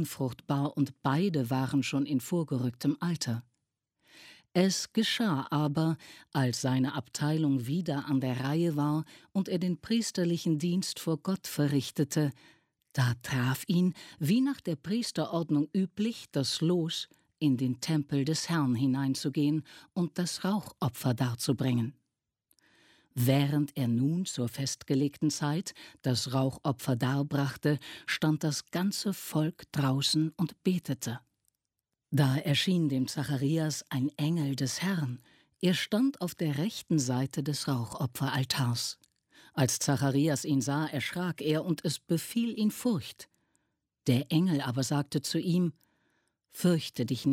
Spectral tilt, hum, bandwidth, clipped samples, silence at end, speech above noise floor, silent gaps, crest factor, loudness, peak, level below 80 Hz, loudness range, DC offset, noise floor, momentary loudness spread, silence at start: -5.5 dB/octave; none; 16.5 kHz; under 0.1%; 0 s; 57 dB; none; 18 dB; -31 LUFS; -12 dBFS; -70 dBFS; 2 LU; under 0.1%; -87 dBFS; 6 LU; 0 s